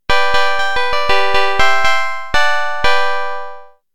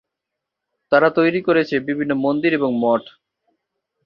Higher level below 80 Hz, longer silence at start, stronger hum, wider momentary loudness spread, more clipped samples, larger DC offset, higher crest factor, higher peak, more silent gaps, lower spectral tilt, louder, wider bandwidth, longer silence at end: first, -34 dBFS vs -64 dBFS; second, 0 s vs 0.9 s; neither; about the same, 7 LU vs 6 LU; neither; first, 20% vs under 0.1%; about the same, 16 dB vs 18 dB; about the same, 0 dBFS vs -2 dBFS; neither; second, -2 dB/octave vs -8 dB/octave; first, -15 LUFS vs -18 LUFS; first, 17 kHz vs 6.6 kHz; second, 0 s vs 0.95 s